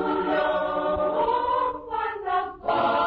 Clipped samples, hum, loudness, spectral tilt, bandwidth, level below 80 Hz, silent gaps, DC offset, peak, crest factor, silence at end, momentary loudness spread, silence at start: under 0.1%; none; -25 LUFS; -7.5 dB/octave; 5.8 kHz; -50 dBFS; none; under 0.1%; -12 dBFS; 12 dB; 0 s; 5 LU; 0 s